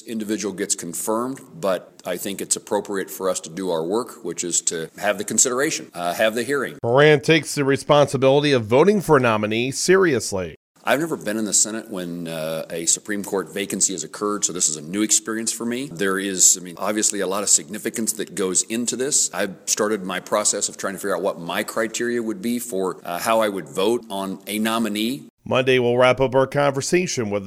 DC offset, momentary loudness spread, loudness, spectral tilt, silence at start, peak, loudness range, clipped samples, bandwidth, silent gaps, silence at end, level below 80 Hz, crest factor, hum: under 0.1%; 10 LU; -21 LUFS; -3 dB/octave; 0.05 s; -2 dBFS; 6 LU; under 0.1%; 16 kHz; 10.56-10.75 s, 25.30-25.38 s; 0 s; -58 dBFS; 18 dB; none